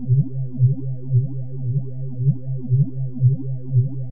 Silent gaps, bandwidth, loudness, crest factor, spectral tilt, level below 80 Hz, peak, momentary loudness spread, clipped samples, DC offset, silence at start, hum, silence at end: none; 0.8 kHz; -22 LUFS; 14 dB; -16.5 dB/octave; -48 dBFS; -6 dBFS; 7 LU; under 0.1%; 4%; 0 s; none; 0 s